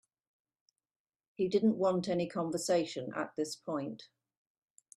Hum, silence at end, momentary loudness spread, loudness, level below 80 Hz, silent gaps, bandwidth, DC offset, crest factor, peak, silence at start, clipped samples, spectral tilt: none; 0.9 s; 9 LU; -34 LUFS; -78 dBFS; none; 14 kHz; under 0.1%; 18 dB; -18 dBFS; 1.4 s; under 0.1%; -5.5 dB/octave